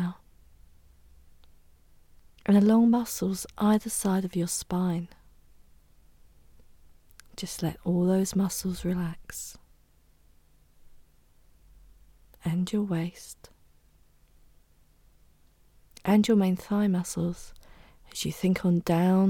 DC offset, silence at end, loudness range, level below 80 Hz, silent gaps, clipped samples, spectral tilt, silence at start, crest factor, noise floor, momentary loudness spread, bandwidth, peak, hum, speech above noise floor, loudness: under 0.1%; 0 s; 11 LU; -54 dBFS; none; under 0.1%; -6 dB/octave; 0 s; 18 dB; -61 dBFS; 17 LU; 18.5 kHz; -10 dBFS; none; 35 dB; -27 LUFS